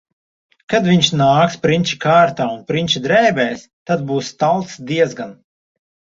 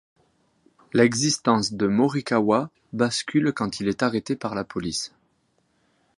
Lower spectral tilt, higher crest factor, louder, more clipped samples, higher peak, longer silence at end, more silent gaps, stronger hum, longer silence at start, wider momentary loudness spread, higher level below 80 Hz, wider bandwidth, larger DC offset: about the same, -5 dB/octave vs -4.5 dB/octave; about the same, 16 dB vs 20 dB; first, -16 LUFS vs -23 LUFS; neither; first, 0 dBFS vs -4 dBFS; second, 0.8 s vs 1.1 s; first, 3.73-3.86 s vs none; neither; second, 0.7 s vs 0.95 s; about the same, 9 LU vs 9 LU; about the same, -54 dBFS vs -58 dBFS; second, 7.8 kHz vs 11.5 kHz; neither